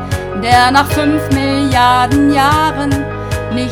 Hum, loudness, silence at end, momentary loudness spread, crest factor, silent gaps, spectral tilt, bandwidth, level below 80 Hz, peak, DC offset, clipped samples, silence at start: none; -12 LUFS; 0 s; 9 LU; 12 dB; none; -5.5 dB/octave; 18.5 kHz; -30 dBFS; 0 dBFS; under 0.1%; 0.3%; 0 s